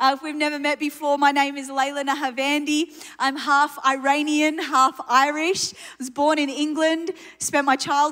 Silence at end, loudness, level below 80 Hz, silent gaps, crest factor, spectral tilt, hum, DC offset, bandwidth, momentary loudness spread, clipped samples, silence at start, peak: 0 s; -21 LUFS; -72 dBFS; none; 18 dB; -1.5 dB/octave; none; under 0.1%; 16 kHz; 6 LU; under 0.1%; 0 s; -4 dBFS